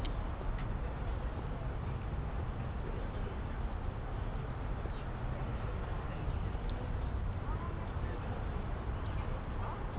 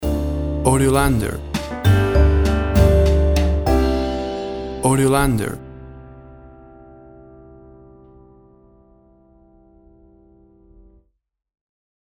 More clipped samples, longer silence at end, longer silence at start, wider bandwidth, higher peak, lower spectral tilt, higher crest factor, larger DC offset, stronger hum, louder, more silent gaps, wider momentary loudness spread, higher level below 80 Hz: neither; second, 0 s vs 5.75 s; about the same, 0 s vs 0 s; second, 4 kHz vs 19.5 kHz; second, -24 dBFS vs -2 dBFS; about the same, -7 dB/octave vs -6.5 dB/octave; second, 12 dB vs 18 dB; neither; neither; second, -40 LUFS vs -18 LUFS; neither; second, 2 LU vs 12 LU; second, -40 dBFS vs -24 dBFS